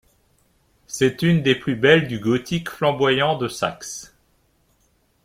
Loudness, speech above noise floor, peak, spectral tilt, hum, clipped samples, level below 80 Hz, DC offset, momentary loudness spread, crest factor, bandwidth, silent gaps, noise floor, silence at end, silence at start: -20 LUFS; 44 dB; -2 dBFS; -5 dB/octave; none; under 0.1%; -54 dBFS; under 0.1%; 15 LU; 20 dB; 16 kHz; none; -63 dBFS; 1.2 s; 0.9 s